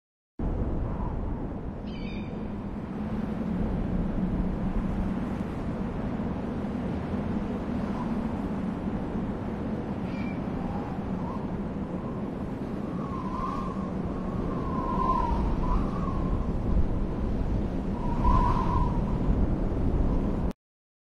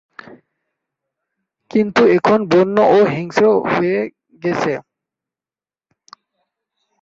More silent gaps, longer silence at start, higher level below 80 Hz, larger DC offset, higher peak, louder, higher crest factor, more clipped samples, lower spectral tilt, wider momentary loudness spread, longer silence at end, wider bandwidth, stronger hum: neither; about the same, 0.4 s vs 0.3 s; first, -32 dBFS vs -60 dBFS; first, 0.1% vs under 0.1%; second, -10 dBFS vs -2 dBFS; second, -31 LUFS vs -15 LUFS; about the same, 18 dB vs 16 dB; neither; first, -9 dB/octave vs -6.5 dB/octave; second, 7 LU vs 10 LU; second, 0.55 s vs 2.2 s; about the same, 7.2 kHz vs 7.6 kHz; neither